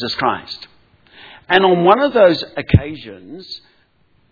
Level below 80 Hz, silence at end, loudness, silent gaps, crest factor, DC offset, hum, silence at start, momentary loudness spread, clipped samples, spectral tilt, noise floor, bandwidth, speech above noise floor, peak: -36 dBFS; 0.75 s; -14 LUFS; none; 18 dB; under 0.1%; none; 0 s; 21 LU; under 0.1%; -7.5 dB/octave; -57 dBFS; 5.4 kHz; 42 dB; 0 dBFS